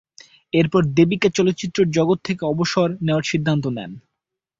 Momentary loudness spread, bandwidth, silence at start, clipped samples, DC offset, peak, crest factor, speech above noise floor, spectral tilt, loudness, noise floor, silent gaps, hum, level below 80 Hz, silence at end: 6 LU; 7.8 kHz; 0.55 s; under 0.1%; under 0.1%; -2 dBFS; 18 dB; 63 dB; -6 dB/octave; -19 LUFS; -81 dBFS; none; none; -54 dBFS; 0.6 s